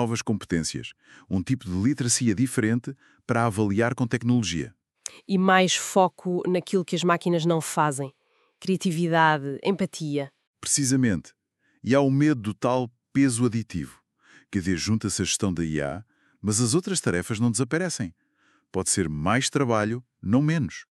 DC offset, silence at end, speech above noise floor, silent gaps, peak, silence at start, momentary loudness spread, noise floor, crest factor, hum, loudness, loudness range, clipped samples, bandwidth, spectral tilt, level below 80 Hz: under 0.1%; 0.1 s; 42 dB; 10.47-10.54 s; -4 dBFS; 0 s; 12 LU; -66 dBFS; 20 dB; none; -25 LUFS; 3 LU; under 0.1%; 13.5 kHz; -4.5 dB/octave; -56 dBFS